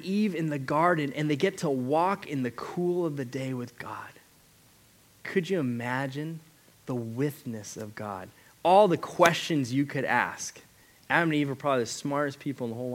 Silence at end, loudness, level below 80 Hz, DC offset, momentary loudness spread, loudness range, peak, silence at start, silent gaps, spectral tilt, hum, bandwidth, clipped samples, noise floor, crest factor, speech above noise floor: 0 s; -28 LUFS; -72 dBFS; under 0.1%; 15 LU; 8 LU; -4 dBFS; 0 s; none; -5.5 dB/octave; none; 17 kHz; under 0.1%; -59 dBFS; 24 dB; 31 dB